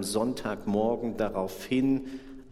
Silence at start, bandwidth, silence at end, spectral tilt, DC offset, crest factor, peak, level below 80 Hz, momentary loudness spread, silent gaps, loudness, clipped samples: 0 s; 15.5 kHz; 0 s; -5.5 dB/octave; under 0.1%; 16 dB; -14 dBFS; -52 dBFS; 7 LU; none; -29 LUFS; under 0.1%